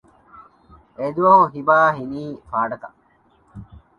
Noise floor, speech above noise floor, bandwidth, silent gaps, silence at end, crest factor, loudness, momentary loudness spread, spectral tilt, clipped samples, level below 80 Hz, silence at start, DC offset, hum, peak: -58 dBFS; 40 dB; 6.8 kHz; none; 0.2 s; 20 dB; -18 LUFS; 16 LU; -8 dB/octave; under 0.1%; -56 dBFS; 0.35 s; under 0.1%; none; -2 dBFS